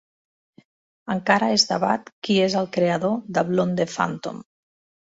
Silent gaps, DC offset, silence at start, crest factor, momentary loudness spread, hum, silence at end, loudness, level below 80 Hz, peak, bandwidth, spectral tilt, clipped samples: 2.12-2.22 s; under 0.1%; 1.05 s; 20 dB; 12 LU; none; 0.65 s; -22 LUFS; -64 dBFS; -4 dBFS; 8 kHz; -4.5 dB/octave; under 0.1%